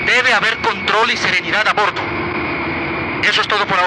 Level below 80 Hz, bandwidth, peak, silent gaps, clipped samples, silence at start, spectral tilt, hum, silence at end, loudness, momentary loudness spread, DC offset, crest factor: -46 dBFS; 12 kHz; -2 dBFS; none; under 0.1%; 0 s; -3 dB/octave; none; 0 s; -15 LUFS; 7 LU; under 0.1%; 14 dB